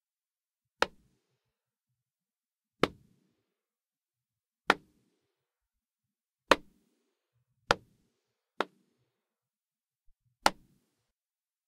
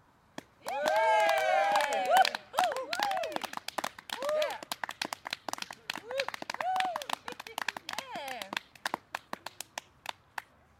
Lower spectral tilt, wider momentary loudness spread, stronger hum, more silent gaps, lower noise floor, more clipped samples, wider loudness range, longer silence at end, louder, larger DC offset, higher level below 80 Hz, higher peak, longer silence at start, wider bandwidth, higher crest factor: first, -3 dB/octave vs -1 dB/octave; second, 10 LU vs 17 LU; neither; neither; first, under -90 dBFS vs -51 dBFS; neither; second, 6 LU vs 10 LU; first, 1.15 s vs 0.4 s; about the same, -32 LUFS vs -32 LUFS; neither; first, -64 dBFS vs -76 dBFS; about the same, -6 dBFS vs -8 dBFS; first, 0.8 s vs 0.65 s; about the same, 15.5 kHz vs 17 kHz; first, 32 dB vs 24 dB